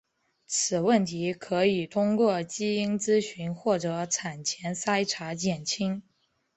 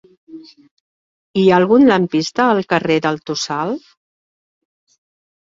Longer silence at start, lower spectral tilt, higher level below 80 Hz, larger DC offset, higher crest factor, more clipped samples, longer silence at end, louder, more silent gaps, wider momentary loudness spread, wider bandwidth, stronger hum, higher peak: first, 0.5 s vs 0.3 s; second, -4 dB/octave vs -5.5 dB/octave; second, -68 dBFS vs -58 dBFS; neither; about the same, 18 dB vs 16 dB; neither; second, 0.55 s vs 1.8 s; second, -27 LUFS vs -15 LUFS; second, none vs 0.71-1.34 s; second, 7 LU vs 11 LU; about the same, 8.4 kHz vs 7.8 kHz; neither; second, -10 dBFS vs -2 dBFS